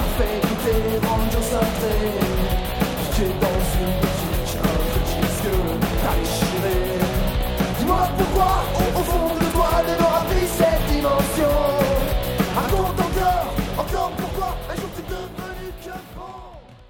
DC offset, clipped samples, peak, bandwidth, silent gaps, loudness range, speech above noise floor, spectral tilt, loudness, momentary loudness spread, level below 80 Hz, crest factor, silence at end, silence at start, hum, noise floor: under 0.1%; under 0.1%; -6 dBFS; over 20 kHz; none; 4 LU; 21 dB; -5.5 dB/octave; -21 LUFS; 10 LU; -26 dBFS; 16 dB; 0.05 s; 0 s; none; -41 dBFS